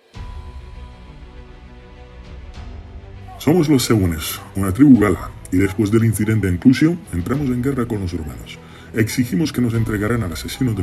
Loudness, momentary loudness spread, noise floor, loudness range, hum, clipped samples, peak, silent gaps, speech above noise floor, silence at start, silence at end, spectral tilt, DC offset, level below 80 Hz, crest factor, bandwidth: -18 LUFS; 23 LU; -39 dBFS; 8 LU; none; under 0.1%; 0 dBFS; none; 22 dB; 0.15 s; 0 s; -6.5 dB/octave; under 0.1%; -38 dBFS; 18 dB; 13 kHz